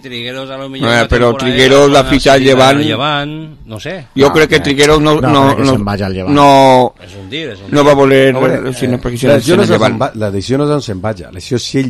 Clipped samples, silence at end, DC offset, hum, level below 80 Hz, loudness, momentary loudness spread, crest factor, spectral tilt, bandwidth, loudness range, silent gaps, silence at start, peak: 0.6%; 0 s; under 0.1%; none; -32 dBFS; -10 LUFS; 15 LU; 10 dB; -5 dB/octave; 15 kHz; 2 LU; none; 0.05 s; 0 dBFS